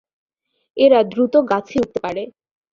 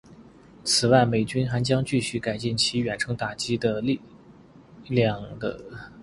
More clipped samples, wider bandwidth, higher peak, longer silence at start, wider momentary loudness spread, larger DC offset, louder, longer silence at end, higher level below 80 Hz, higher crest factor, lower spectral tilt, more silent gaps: neither; second, 7.2 kHz vs 11.5 kHz; about the same, -2 dBFS vs -4 dBFS; first, 0.75 s vs 0.1 s; first, 16 LU vs 13 LU; neither; first, -17 LUFS vs -25 LUFS; first, 0.45 s vs 0 s; about the same, -56 dBFS vs -54 dBFS; second, 16 dB vs 22 dB; first, -6.5 dB/octave vs -4.5 dB/octave; neither